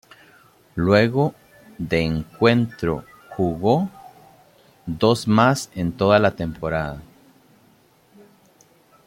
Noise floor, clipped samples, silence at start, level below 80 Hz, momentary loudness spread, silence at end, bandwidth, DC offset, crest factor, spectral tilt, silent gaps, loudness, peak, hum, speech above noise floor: -56 dBFS; under 0.1%; 0.75 s; -48 dBFS; 15 LU; 2 s; 16.5 kHz; under 0.1%; 20 dB; -6.5 dB/octave; none; -20 LUFS; -2 dBFS; none; 37 dB